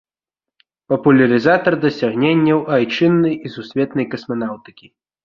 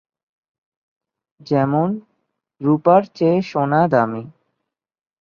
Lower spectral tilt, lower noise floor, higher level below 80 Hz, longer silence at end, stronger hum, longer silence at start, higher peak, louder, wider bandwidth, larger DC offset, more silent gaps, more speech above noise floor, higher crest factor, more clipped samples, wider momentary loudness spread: about the same, -8 dB/octave vs -9 dB/octave; first, -87 dBFS vs -79 dBFS; first, -58 dBFS vs -64 dBFS; second, 0.65 s vs 0.9 s; neither; second, 0.9 s vs 1.45 s; about the same, -2 dBFS vs -2 dBFS; about the same, -16 LUFS vs -18 LUFS; about the same, 7 kHz vs 7 kHz; neither; neither; first, 71 dB vs 62 dB; about the same, 16 dB vs 18 dB; neither; about the same, 11 LU vs 9 LU